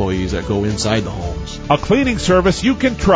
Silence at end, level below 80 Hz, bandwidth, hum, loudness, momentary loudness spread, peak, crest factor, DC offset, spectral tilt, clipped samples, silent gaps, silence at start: 0 s; -28 dBFS; 8 kHz; none; -17 LUFS; 11 LU; 0 dBFS; 16 dB; under 0.1%; -5.5 dB/octave; under 0.1%; none; 0 s